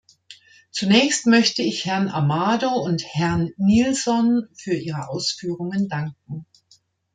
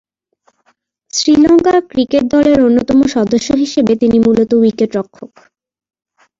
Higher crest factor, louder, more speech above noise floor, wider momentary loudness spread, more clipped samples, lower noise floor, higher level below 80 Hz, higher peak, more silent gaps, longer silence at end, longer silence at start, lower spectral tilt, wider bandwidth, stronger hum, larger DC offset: first, 18 dB vs 12 dB; second, -21 LUFS vs -11 LUFS; second, 38 dB vs 48 dB; first, 12 LU vs 8 LU; neither; about the same, -59 dBFS vs -59 dBFS; second, -56 dBFS vs -44 dBFS; about the same, -2 dBFS vs -2 dBFS; neither; second, 0.7 s vs 1.15 s; second, 0.3 s vs 1.15 s; about the same, -4.5 dB/octave vs -5 dB/octave; first, 9.4 kHz vs 7.8 kHz; neither; neither